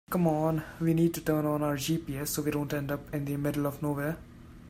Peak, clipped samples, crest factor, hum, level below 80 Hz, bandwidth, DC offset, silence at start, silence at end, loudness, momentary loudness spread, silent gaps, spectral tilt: -14 dBFS; under 0.1%; 16 dB; none; -54 dBFS; 16 kHz; under 0.1%; 0.1 s; 0 s; -30 LUFS; 7 LU; none; -6 dB/octave